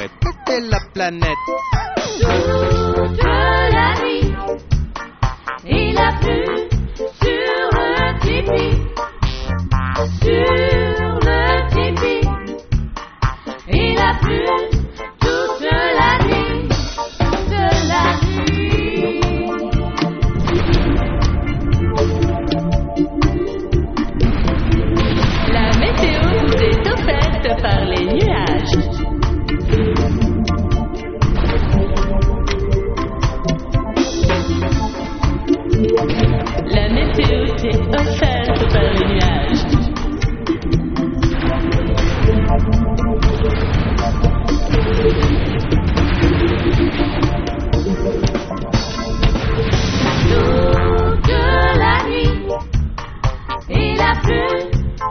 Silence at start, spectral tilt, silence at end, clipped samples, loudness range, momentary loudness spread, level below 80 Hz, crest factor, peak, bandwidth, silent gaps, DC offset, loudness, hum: 0 s; -5 dB/octave; 0 s; under 0.1%; 3 LU; 7 LU; -20 dBFS; 14 dB; -2 dBFS; 6.6 kHz; none; under 0.1%; -17 LUFS; none